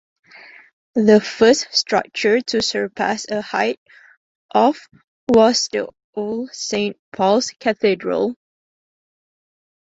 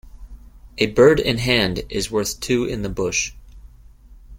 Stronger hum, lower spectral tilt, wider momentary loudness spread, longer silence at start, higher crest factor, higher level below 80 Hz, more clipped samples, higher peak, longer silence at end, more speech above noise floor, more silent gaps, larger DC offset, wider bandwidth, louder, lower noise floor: neither; about the same, -3.5 dB/octave vs -4 dB/octave; about the same, 12 LU vs 11 LU; first, 0.95 s vs 0.05 s; about the same, 18 dB vs 20 dB; second, -58 dBFS vs -38 dBFS; neither; about the same, -2 dBFS vs -2 dBFS; first, 1.6 s vs 0 s; about the same, 26 dB vs 26 dB; first, 3.77-3.86 s, 4.17-4.49 s, 5.04-5.27 s, 6.04-6.13 s, 6.99-7.12 s vs none; neither; second, 8 kHz vs 16.5 kHz; about the same, -18 LUFS vs -19 LUFS; about the same, -44 dBFS vs -45 dBFS